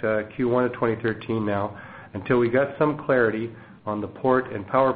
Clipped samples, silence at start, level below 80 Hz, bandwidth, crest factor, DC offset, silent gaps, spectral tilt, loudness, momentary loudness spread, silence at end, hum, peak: under 0.1%; 0 s; -56 dBFS; 4.8 kHz; 18 dB; under 0.1%; none; -6 dB/octave; -24 LUFS; 12 LU; 0 s; none; -6 dBFS